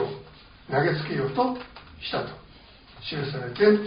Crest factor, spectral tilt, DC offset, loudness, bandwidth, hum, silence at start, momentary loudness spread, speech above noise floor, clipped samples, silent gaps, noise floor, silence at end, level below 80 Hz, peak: 20 dB; -4.5 dB/octave; under 0.1%; -27 LUFS; 5.2 kHz; none; 0 s; 20 LU; 26 dB; under 0.1%; none; -50 dBFS; 0 s; -56 dBFS; -8 dBFS